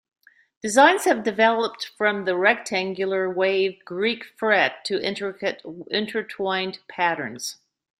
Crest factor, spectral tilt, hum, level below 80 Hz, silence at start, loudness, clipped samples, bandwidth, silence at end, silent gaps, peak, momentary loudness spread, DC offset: 20 dB; -3 dB/octave; none; -70 dBFS; 0.65 s; -22 LUFS; under 0.1%; 15.5 kHz; 0.45 s; none; -4 dBFS; 11 LU; under 0.1%